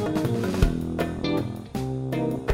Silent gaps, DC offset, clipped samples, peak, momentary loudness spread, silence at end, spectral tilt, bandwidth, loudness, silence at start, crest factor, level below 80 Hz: none; under 0.1%; under 0.1%; -4 dBFS; 6 LU; 0 s; -7 dB/octave; 16 kHz; -27 LUFS; 0 s; 22 dB; -34 dBFS